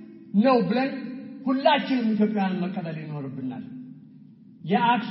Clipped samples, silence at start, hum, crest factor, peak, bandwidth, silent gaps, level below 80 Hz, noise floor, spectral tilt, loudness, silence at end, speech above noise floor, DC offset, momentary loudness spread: under 0.1%; 0 s; none; 20 dB; -6 dBFS; 5.8 kHz; none; -76 dBFS; -49 dBFS; -5 dB/octave; -25 LUFS; 0 s; 25 dB; under 0.1%; 17 LU